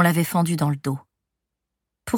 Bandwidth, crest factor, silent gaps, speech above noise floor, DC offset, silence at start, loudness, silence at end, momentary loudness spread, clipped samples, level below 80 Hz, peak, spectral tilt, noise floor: 19 kHz; 20 dB; none; 62 dB; under 0.1%; 0 s; -23 LUFS; 0 s; 13 LU; under 0.1%; -58 dBFS; -4 dBFS; -6 dB/octave; -83 dBFS